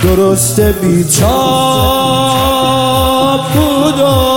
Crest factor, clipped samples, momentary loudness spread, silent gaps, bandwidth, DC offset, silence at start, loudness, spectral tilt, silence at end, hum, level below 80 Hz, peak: 10 dB; under 0.1%; 2 LU; none; 17 kHz; 0.7%; 0 s; -10 LUFS; -4.5 dB/octave; 0 s; none; -24 dBFS; 0 dBFS